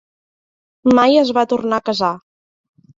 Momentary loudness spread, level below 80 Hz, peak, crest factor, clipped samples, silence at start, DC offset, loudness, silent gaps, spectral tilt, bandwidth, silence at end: 9 LU; -58 dBFS; -2 dBFS; 16 dB; under 0.1%; 0.85 s; under 0.1%; -15 LUFS; none; -5.5 dB/octave; 7.6 kHz; 0.8 s